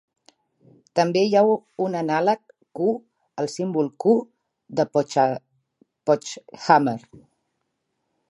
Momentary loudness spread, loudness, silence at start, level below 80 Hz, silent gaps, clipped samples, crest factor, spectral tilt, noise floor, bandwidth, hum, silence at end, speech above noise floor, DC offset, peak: 13 LU; -22 LUFS; 0.95 s; -74 dBFS; none; under 0.1%; 22 dB; -5.5 dB/octave; -76 dBFS; 11.5 kHz; none; 1.3 s; 55 dB; under 0.1%; -2 dBFS